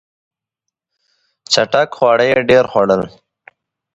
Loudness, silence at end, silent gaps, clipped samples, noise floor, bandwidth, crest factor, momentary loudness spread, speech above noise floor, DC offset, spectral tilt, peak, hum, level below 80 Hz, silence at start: -13 LUFS; 0.85 s; none; under 0.1%; -80 dBFS; 8.2 kHz; 16 dB; 5 LU; 67 dB; under 0.1%; -4 dB/octave; 0 dBFS; none; -54 dBFS; 1.5 s